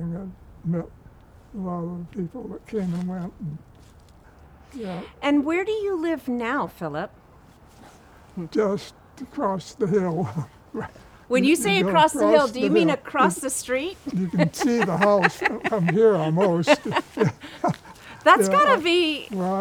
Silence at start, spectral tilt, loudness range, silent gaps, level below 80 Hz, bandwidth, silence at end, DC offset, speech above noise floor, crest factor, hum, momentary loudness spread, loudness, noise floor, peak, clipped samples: 0 s; -5 dB/octave; 11 LU; none; -54 dBFS; 19 kHz; 0 s; under 0.1%; 28 dB; 22 dB; none; 17 LU; -22 LUFS; -51 dBFS; -2 dBFS; under 0.1%